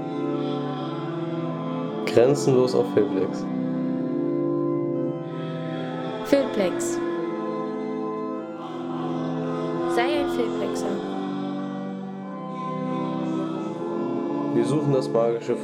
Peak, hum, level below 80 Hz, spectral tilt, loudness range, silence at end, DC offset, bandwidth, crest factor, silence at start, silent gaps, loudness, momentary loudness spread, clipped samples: -4 dBFS; none; -64 dBFS; -6.5 dB/octave; 5 LU; 0 s; under 0.1%; 16 kHz; 20 dB; 0 s; none; -26 LUFS; 9 LU; under 0.1%